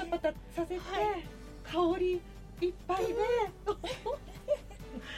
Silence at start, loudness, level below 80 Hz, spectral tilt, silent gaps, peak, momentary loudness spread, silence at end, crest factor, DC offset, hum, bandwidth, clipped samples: 0 s; -34 LUFS; -50 dBFS; -5.5 dB/octave; none; -20 dBFS; 12 LU; 0 s; 16 dB; under 0.1%; none; 15.5 kHz; under 0.1%